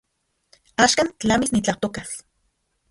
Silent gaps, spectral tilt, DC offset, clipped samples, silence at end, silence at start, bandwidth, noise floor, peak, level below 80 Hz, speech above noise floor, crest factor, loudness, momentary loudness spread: none; -3 dB/octave; under 0.1%; under 0.1%; 0.7 s; 0.8 s; 11.5 kHz; -72 dBFS; -2 dBFS; -50 dBFS; 50 dB; 22 dB; -21 LUFS; 16 LU